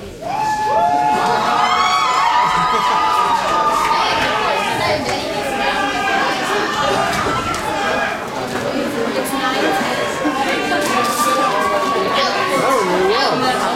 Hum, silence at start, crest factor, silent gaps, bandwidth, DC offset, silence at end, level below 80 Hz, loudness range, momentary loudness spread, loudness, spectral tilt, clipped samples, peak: none; 0 s; 14 dB; none; 16.5 kHz; under 0.1%; 0 s; -46 dBFS; 4 LU; 6 LU; -16 LUFS; -3 dB/octave; under 0.1%; -2 dBFS